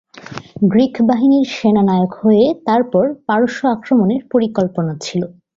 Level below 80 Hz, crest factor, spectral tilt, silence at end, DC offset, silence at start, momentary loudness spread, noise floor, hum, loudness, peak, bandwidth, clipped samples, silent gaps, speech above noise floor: -54 dBFS; 14 dB; -7 dB/octave; 0.3 s; under 0.1%; 0.15 s; 9 LU; -33 dBFS; none; -15 LUFS; -2 dBFS; 7.6 kHz; under 0.1%; none; 19 dB